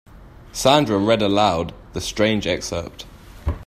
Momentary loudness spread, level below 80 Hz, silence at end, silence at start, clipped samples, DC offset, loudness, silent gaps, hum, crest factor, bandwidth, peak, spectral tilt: 17 LU; -38 dBFS; 0 s; 0.15 s; under 0.1%; under 0.1%; -20 LUFS; none; none; 20 dB; 15 kHz; 0 dBFS; -4.5 dB/octave